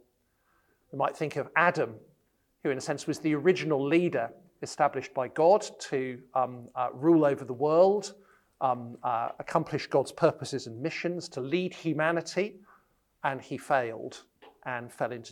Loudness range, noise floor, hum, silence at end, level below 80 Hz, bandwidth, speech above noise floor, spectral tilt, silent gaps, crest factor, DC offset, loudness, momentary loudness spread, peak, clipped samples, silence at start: 5 LU; -72 dBFS; none; 0 s; -74 dBFS; 12.5 kHz; 43 dB; -5.5 dB/octave; none; 22 dB; under 0.1%; -29 LUFS; 13 LU; -8 dBFS; under 0.1%; 0.95 s